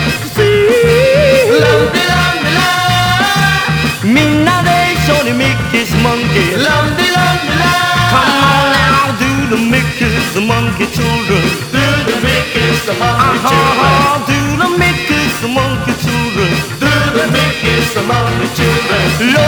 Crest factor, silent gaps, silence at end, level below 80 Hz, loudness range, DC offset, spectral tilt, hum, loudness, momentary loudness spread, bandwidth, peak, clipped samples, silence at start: 10 dB; none; 0 s; -30 dBFS; 3 LU; under 0.1%; -4.5 dB/octave; none; -11 LUFS; 5 LU; over 20 kHz; 0 dBFS; under 0.1%; 0 s